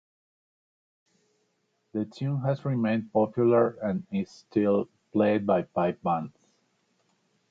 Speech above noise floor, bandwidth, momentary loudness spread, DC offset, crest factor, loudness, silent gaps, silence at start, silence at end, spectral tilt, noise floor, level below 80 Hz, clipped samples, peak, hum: 48 dB; 7.6 kHz; 10 LU; under 0.1%; 18 dB; -27 LUFS; none; 1.95 s; 1.2 s; -9 dB/octave; -74 dBFS; -66 dBFS; under 0.1%; -12 dBFS; none